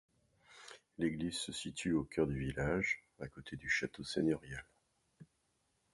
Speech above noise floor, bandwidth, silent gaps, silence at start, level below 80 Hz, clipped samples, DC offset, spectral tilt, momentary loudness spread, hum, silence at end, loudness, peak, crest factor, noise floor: 42 dB; 11.5 kHz; none; 0.5 s; -58 dBFS; under 0.1%; under 0.1%; -5 dB/octave; 15 LU; none; 0.7 s; -38 LUFS; -20 dBFS; 20 dB; -80 dBFS